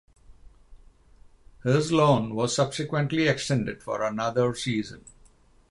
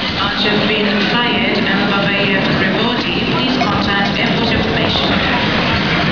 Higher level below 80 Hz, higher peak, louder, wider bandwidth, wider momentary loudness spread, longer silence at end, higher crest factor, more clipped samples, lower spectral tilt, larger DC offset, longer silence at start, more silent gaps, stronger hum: second, -56 dBFS vs -36 dBFS; second, -8 dBFS vs 0 dBFS; second, -25 LUFS vs -14 LUFS; first, 11.5 kHz vs 5.4 kHz; first, 9 LU vs 2 LU; first, 0.75 s vs 0 s; first, 20 dB vs 14 dB; neither; about the same, -5.5 dB/octave vs -5.5 dB/octave; second, under 0.1% vs 0.8%; first, 0.3 s vs 0 s; neither; neither